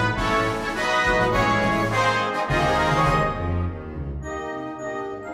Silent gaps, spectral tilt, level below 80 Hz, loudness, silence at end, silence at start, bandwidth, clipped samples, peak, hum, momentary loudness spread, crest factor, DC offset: none; -5.5 dB/octave; -36 dBFS; -22 LUFS; 0 s; 0 s; 15.5 kHz; under 0.1%; -8 dBFS; none; 11 LU; 14 dB; under 0.1%